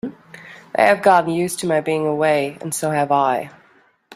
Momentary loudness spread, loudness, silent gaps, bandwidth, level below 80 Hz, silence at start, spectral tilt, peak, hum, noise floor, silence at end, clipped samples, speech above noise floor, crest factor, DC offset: 16 LU; -18 LUFS; none; 15.5 kHz; -64 dBFS; 0.05 s; -4.5 dB/octave; -2 dBFS; none; -55 dBFS; 0.65 s; under 0.1%; 38 dB; 18 dB; under 0.1%